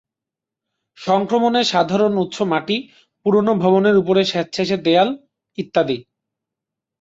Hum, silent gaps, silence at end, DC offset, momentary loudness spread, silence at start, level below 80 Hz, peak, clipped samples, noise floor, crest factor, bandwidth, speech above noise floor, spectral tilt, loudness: none; none; 1 s; under 0.1%; 10 LU; 1 s; -62 dBFS; -2 dBFS; under 0.1%; -86 dBFS; 16 dB; 7.8 kHz; 69 dB; -5.5 dB/octave; -18 LUFS